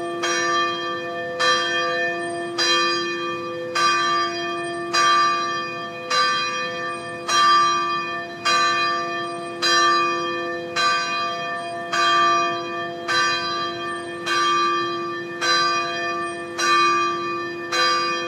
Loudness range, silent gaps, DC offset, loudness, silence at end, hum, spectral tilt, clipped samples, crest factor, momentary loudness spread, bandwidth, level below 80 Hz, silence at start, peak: 2 LU; none; under 0.1%; -21 LUFS; 0 s; none; -1.5 dB/octave; under 0.1%; 16 dB; 10 LU; 15 kHz; -70 dBFS; 0 s; -6 dBFS